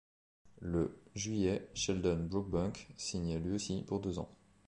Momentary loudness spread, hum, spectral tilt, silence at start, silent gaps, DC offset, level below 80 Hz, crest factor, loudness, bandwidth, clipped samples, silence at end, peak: 8 LU; none; -5.5 dB/octave; 0.45 s; none; under 0.1%; -52 dBFS; 18 dB; -37 LUFS; 10.5 kHz; under 0.1%; 0.35 s; -20 dBFS